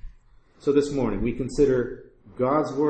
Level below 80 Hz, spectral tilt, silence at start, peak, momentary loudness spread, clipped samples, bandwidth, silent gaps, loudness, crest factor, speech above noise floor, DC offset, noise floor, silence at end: -42 dBFS; -7 dB/octave; 0 s; -8 dBFS; 8 LU; under 0.1%; 8.8 kHz; none; -24 LUFS; 16 dB; 31 dB; under 0.1%; -54 dBFS; 0 s